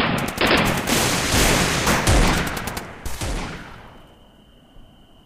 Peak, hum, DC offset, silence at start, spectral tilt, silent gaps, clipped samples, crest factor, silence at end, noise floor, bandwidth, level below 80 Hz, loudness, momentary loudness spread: -4 dBFS; none; under 0.1%; 0 s; -3.5 dB/octave; none; under 0.1%; 18 dB; 0.45 s; -50 dBFS; 16 kHz; -30 dBFS; -19 LUFS; 15 LU